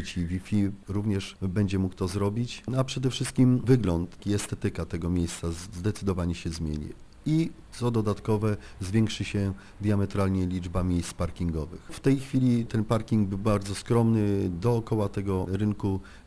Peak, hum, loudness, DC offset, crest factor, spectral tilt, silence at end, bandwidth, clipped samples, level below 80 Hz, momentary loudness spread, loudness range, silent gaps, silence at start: -10 dBFS; none; -28 LUFS; under 0.1%; 18 dB; -7 dB/octave; 0.05 s; 11 kHz; under 0.1%; -44 dBFS; 8 LU; 4 LU; none; 0 s